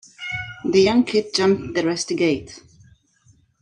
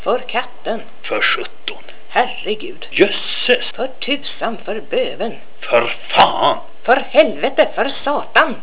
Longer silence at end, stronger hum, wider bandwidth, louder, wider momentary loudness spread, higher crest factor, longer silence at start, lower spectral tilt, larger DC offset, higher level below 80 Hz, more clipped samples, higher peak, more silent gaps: first, 1.05 s vs 0 s; neither; first, 11 kHz vs 4 kHz; second, -20 LUFS vs -17 LUFS; about the same, 12 LU vs 12 LU; about the same, 16 dB vs 18 dB; first, 0.2 s vs 0 s; second, -4.5 dB/octave vs -7.5 dB/octave; second, under 0.1% vs 7%; about the same, -54 dBFS vs -58 dBFS; neither; second, -6 dBFS vs 0 dBFS; neither